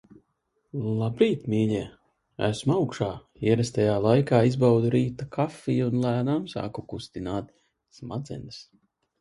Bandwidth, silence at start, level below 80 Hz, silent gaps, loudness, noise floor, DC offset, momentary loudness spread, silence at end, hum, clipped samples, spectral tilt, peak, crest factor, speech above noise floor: 11.5 kHz; 0.75 s; -56 dBFS; none; -26 LUFS; -74 dBFS; under 0.1%; 16 LU; 0.6 s; none; under 0.1%; -7.5 dB/octave; -6 dBFS; 20 dB; 49 dB